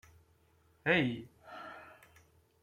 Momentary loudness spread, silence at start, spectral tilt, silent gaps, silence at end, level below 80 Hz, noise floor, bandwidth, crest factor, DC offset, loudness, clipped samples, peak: 22 LU; 0.85 s; -6.5 dB/octave; none; 0.8 s; -70 dBFS; -69 dBFS; 16 kHz; 24 dB; under 0.1%; -33 LUFS; under 0.1%; -16 dBFS